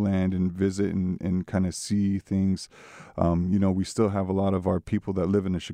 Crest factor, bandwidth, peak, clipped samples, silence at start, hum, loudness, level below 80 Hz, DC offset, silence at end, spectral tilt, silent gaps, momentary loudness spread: 16 dB; 11 kHz; -10 dBFS; under 0.1%; 0 s; none; -26 LUFS; -50 dBFS; under 0.1%; 0 s; -7 dB/octave; none; 4 LU